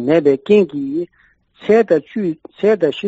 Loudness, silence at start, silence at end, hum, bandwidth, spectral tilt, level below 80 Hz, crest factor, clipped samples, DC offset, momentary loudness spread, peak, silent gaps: -16 LUFS; 0 s; 0 s; none; 7.8 kHz; -5.5 dB/octave; -60 dBFS; 14 dB; under 0.1%; under 0.1%; 11 LU; -2 dBFS; none